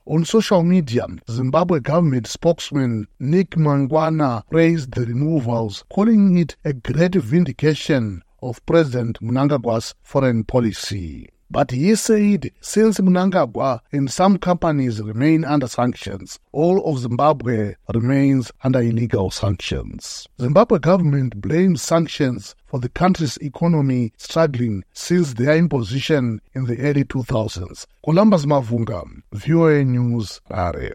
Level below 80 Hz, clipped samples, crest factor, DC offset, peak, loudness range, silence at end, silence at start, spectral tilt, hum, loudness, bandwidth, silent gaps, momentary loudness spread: -44 dBFS; under 0.1%; 16 dB; under 0.1%; -2 dBFS; 2 LU; 0 s; 0.05 s; -6.5 dB/octave; none; -19 LUFS; 15.5 kHz; none; 11 LU